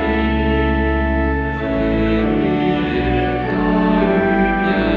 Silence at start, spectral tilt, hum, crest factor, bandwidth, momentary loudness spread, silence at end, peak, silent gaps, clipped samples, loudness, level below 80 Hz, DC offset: 0 s; -9 dB/octave; none; 12 dB; 5.6 kHz; 3 LU; 0 s; -4 dBFS; none; under 0.1%; -17 LUFS; -26 dBFS; under 0.1%